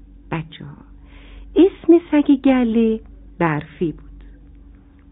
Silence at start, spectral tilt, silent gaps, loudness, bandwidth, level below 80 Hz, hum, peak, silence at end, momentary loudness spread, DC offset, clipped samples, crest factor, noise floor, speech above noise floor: 0.3 s; -6.5 dB/octave; none; -18 LUFS; 3.9 kHz; -42 dBFS; none; -2 dBFS; 0.9 s; 19 LU; under 0.1%; under 0.1%; 16 dB; -45 dBFS; 28 dB